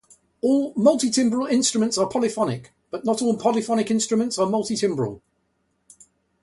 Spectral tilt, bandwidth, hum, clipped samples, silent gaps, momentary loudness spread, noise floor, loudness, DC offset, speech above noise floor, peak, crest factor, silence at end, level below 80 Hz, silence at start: -4.5 dB/octave; 11.5 kHz; none; under 0.1%; none; 8 LU; -70 dBFS; -22 LUFS; under 0.1%; 49 dB; -6 dBFS; 18 dB; 1.25 s; -64 dBFS; 0.45 s